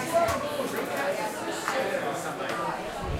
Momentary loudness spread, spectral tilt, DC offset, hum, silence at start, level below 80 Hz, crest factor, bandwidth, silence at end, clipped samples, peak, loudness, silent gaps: 5 LU; -4 dB/octave; under 0.1%; none; 0 s; -48 dBFS; 16 dB; 16 kHz; 0 s; under 0.1%; -12 dBFS; -29 LUFS; none